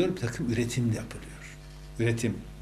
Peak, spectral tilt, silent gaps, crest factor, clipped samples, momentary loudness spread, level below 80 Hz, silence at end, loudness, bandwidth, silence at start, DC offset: -14 dBFS; -6 dB/octave; none; 16 dB; under 0.1%; 16 LU; -48 dBFS; 0 s; -30 LUFS; 14.5 kHz; 0 s; under 0.1%